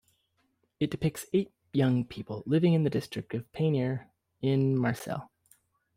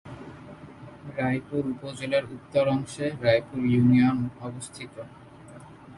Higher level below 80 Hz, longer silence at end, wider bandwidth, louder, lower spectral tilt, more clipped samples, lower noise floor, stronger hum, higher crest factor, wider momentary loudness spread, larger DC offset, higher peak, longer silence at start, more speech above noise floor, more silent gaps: about the same, -62 dBFS vs -58 dBFS; first, 0.7 s vs 0 s; first, 16 kHz vs 11.5 kHz; second, -30 LUFS vs -26 LUFS; about the same, -7.5 dB/octave vs -7 dB/octave; neither; first, -74 dBFS vs -46 dBFS; neither; about the same, 16 dB vs 20 dB; second, 12 LU vs 24 LU; neither; second, -14 dBFS vs -6 dBFS; first, 0.8 s vs 0.05 s; first, 46 dB vs 21 dB; neither